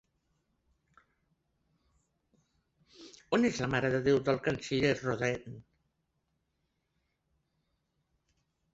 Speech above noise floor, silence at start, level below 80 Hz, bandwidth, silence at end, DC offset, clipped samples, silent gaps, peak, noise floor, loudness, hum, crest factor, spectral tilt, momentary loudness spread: 50 dB; 3 s; -62 dBFS; 8 kHz; 3.15 s; under 0.1%; under 0.1%; none; -14 dBFS; -80 dBFS; -31 LUFS; none; 22 dB; -5.5 dB/octave; 9 LU